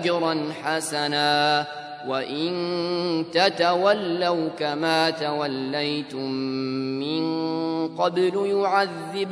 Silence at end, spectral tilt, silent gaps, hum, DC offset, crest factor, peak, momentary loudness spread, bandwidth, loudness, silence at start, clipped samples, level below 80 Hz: 0 s; -4.5 dB/octave; none; none; under 0.1%; 20 dB; -4 dBFS; 7 LU; 11 kHz; -24 LUFS; 0 s; under 0.1%; -74 dBFS